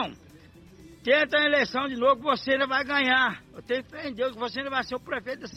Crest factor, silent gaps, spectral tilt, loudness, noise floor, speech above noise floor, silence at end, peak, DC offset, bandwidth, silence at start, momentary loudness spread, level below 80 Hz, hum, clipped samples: 18 dB; none; -4 dB/octave; -25 LUFS; -51 dBFS; 25 dB; 0 s; -10 dBFS; under 0.1%; 13 kHz; 0 s; 11 LU; -60 dBFS; none; under 0.1%